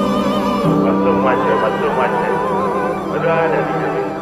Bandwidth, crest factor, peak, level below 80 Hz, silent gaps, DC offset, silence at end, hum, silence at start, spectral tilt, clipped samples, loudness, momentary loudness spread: 15 kHz; 12 dB; -4 dBFS; -44 dBFS; none; under 0.1%; 0 s; none; 0 s; -7 dB/octave; under 0.1%; -16 LUFS; 4 LU